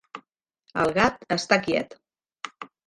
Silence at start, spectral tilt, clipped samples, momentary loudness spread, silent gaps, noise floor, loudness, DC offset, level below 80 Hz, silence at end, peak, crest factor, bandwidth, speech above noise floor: 0.15 s; -4.5 dB/octave; under 0.1%; 18 LU; none; -65 dBFS; -24 LUFS; under 0.1%; -58 dBFS; 0.2 s; -4 dBFS; 22 dB; 11.5 kHz; 42 dB